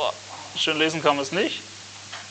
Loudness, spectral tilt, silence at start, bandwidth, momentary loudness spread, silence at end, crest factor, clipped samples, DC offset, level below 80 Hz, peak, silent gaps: -24 LUFS; -3 dB/octave; 0 s; 9.2 kHz; 16 LU; 0 s; 22 dB; under 0.1%; under 0.1%; -72 dBFS; -4 dBFS; none